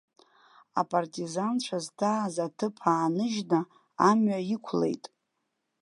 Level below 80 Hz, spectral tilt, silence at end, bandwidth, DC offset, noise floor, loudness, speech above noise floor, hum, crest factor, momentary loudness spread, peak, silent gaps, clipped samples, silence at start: -80 dBFS; -5.5 dB/octave; 0.85 s; 11.5 kHz; under 0.1%; -80 dBFS; -29 LUFS; 53 dB; none; 20 dB; 9 LU; -8 dBFS; none; under 0.1%; 0.75 s